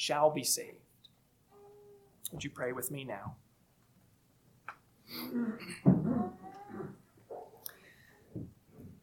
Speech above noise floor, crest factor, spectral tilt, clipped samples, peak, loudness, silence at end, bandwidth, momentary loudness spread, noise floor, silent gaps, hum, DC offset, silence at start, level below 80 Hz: 35 dB; 26 dB; -5 dB/octave; under 0.1%; -12 dBFS; -35 LUFS; 0.1 s; 19 kHz; 23 LU; -68 dBFS; none; none; under 0.1%; 0 s; -68 dBFS